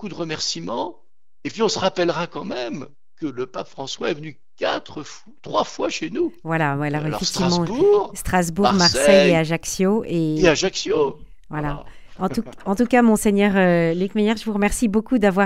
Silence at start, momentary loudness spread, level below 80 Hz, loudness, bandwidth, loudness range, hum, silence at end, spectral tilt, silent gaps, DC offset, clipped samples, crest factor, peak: 0 s; 15 LU; -42 dBFS; -20 LUFS; 16 kHz; 9 LU; none; 0 s; -4.5 dB/octave; none; 0.9%; under 0.1%; 20 dB; 0 dBFS